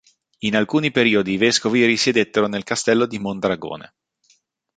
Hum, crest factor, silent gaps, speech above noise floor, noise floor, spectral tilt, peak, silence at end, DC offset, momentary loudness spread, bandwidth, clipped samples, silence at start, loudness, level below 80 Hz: none; 18 dB; none; 43 dB; -62 dBFS; -4 dB/octave; -2 dBFS; 0.95 s; under 0.1%; 9 LU; 9.4 kHz; under 0.1%; 0.4 s; -19 LUFS; -58 dBFS